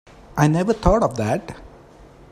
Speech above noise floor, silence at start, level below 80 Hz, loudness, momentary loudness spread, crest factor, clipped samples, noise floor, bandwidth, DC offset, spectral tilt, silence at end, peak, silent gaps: 27 dB; 0.35 s; -34 dBFS; -20 LUFS; 17 LU; 20 dB; under 0.1%; -46 dBFS; 14.5 kHz; under 0.1%; -7 dB/octave; 0.65 s; 0 dBFS; none